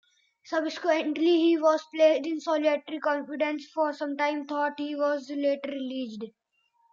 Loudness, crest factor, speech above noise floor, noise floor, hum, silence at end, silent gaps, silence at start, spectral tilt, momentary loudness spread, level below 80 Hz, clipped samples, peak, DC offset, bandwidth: -27 LUFS; 18 dB; 43 dB; -70 dBFS; none; 0.65 s; none; 0.45 s; -4 dB/octave; 11 LU; -88 dBFS; under 0.1%; -10 dBFS; under 0.1%; 7.4 kHz